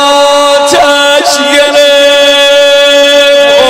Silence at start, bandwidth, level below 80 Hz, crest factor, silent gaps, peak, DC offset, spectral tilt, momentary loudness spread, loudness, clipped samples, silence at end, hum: 0 s; 16.5 kHz; -44 dBFS; 4 dB; none; 0 dBFS; under 0.1%; -0.5 dB/octave; 2 LU; -4 LUFS; 7%; 0 s; none